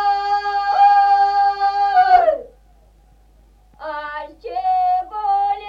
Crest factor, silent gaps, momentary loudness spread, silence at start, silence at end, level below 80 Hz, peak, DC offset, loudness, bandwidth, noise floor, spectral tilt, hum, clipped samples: 16 dB; none; 16 LU; 0 s; 0 s; -50 dBFS; -2 dBFS; under 0.1%; -16 LUFS; 6.8 kHz; -51 dBFS; -3 dB/octave; none; under 0.1%